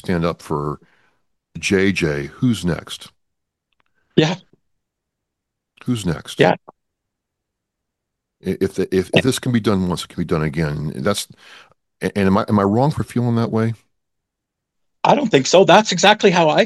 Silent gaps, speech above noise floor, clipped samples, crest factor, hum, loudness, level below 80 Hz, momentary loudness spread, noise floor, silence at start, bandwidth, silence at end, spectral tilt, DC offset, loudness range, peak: none; 63 dB; under 0.1%; 20 dB; none; -18 LUFS; -48 dBFS; 14 LU; -80 dBFS; 0.05 s; 12.5 kHz; 0 s; -5 dB/octave; under 0.1%; 7 LU; 0 dBFS